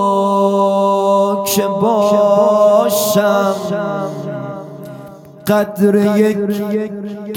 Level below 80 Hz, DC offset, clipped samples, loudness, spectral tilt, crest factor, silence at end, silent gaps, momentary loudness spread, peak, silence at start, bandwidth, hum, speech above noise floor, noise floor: -62 dBFS; under 0.1%; under 0.1%; -14 LUFS; -5.5 dB/octave; 14 dB; 0 s; none; 15 LU; -2 dBFS; 0 s; 18 kHz; none; 21 dB; -35 dBFS